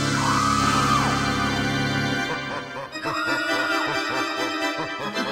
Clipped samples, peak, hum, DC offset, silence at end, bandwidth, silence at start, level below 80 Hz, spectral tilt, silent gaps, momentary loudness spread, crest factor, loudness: under 0.1%; -8 dBFS; none; under 0.1%; 0 s; 16 kHz; 0 s; -46 dBFS; -4 dB/octave; none; 8 LU; 16 dB; -23 LUFS